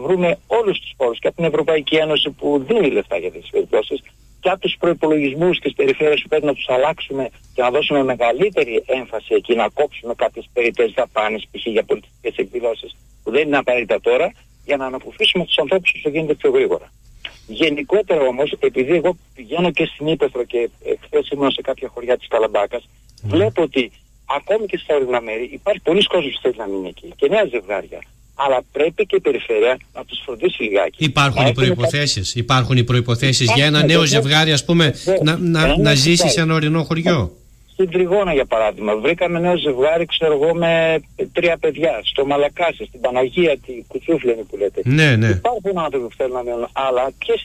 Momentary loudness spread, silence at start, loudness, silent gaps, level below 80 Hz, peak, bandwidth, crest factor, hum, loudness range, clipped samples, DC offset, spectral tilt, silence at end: 10 LU; 0 s; -18 LUFS; none; -42 dBFS; -2 dBFS; 15 kHz; 14 dB; none; 6 LU; under 0.1%; under 0.1%; -5 dB/octave; 0 s